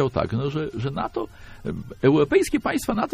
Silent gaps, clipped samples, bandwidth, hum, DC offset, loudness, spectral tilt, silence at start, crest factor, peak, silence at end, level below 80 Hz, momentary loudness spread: none; under 0.1%; 15.5 kHz; none; under 0.1%; -24 LUFS; -6.5 dB/octave; 0 s; 18 dB; -4 dBFS; 0 s; -44 dBFS; 14 LU